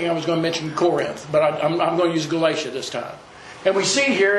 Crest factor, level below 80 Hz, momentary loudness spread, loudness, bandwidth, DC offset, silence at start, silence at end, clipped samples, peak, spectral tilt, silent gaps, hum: 18 dB; -62 dBFS; 11 LU; -21 LUFS; 12 kHz; under 0.1%; 0 s; 0 s; under 0.1%; -4 dBFS; -4 dB/octave; none; none